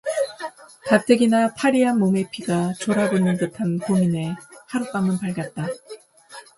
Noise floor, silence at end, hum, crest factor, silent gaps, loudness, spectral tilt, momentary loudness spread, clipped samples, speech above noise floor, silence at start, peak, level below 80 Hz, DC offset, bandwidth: -44 dBFS; 0.15 s; none; 18 dB; none; -21 LUFS; -6.5 dB/octave; 14 LU; under 0.1%; 24 dB; 0.05 s; -2 dBFS; -62 dBFS; under 0.1%; 11.5 kHz